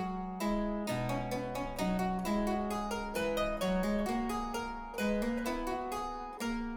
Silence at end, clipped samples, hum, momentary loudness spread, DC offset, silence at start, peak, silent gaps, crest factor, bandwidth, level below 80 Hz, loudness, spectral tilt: 0 s; under 0.1%; none; 5 LU; under 0.1%; 0 s; -20 dBFS; none; 14 dB; over 20 kHz; -46 dBFS; -35 LUFS; -5.5 dB/octave